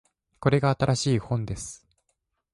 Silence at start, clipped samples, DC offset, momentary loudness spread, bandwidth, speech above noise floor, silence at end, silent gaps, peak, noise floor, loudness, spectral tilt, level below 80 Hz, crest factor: 0.4 s; under 0.1%; under 0.1%; 12 LU; 11.5 kHz; 52 dB; 0.8 s; none; -8 dBFS; -77 dBFS; -26 LUFS; -6 dB/octave; -50 dBFS; 20 dB